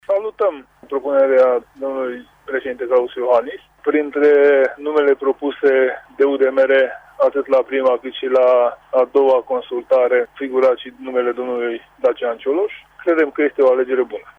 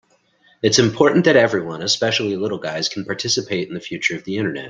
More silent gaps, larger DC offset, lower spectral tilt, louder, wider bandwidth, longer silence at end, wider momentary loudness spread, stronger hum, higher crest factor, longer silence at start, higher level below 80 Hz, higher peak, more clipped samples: neither; neither; first, -5.5 dB/octave vs -4 dB/octave; about the same, -17 LUFS vs -18 LUFS; second, 5 kHz vs 11 kHz; first, 0.2 s vs 0 s; about the same, 11 LU vs 10 LU; neither; second, 12 dB vs 20 dB; second, 0.1 s vs 0.65 s; about the same, -62 dBFS vs -58 dBFS; second, -4 dBFS vs 0 dBFS; neither